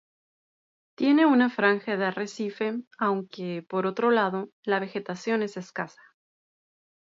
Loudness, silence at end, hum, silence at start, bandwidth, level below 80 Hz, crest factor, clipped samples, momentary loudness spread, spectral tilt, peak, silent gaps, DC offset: -26 LUFS; 1.15 s; none; 1 s; 7.8 kHz; -80 dBFS; 20 dB; under 0.1%; 13 LU; -6 dB/octave; -6 dBFS; 2.87-2.91 s, 4.53-4.63 s; under 0.1%